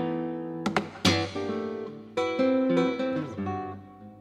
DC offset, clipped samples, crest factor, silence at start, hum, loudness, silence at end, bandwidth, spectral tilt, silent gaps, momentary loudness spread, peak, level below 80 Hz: under 0.1%; under 0.1%; 20 dB; 0 s; none; -28 LUFS; 0 s; 14 kHz; -5 dB/octave; none; 11 LU; -10 dBFS; -66 dBFS